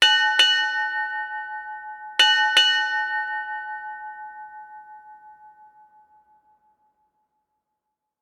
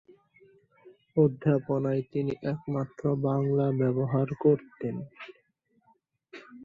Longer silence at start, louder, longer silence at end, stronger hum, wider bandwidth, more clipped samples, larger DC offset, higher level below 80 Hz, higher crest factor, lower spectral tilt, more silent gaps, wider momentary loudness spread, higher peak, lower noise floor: second, 0 s vs 0.85 s; first, -19 LUFS vs -28 LUFS; first, 2.75 s vs 0 s; neither; first, 18 kHz vs 4.9 kHz; neither; neither; second, -78 dBFS vs -66 dBFS; about the same, 22 dB vs 18 dB; second, 3.5 dB/octave vs -10.5 dB/octave; neither; first, 23 LU vs 16 LU; first, -4 dBFS vs -10 dBFS; first, -81 dBFS vs -70 dBFS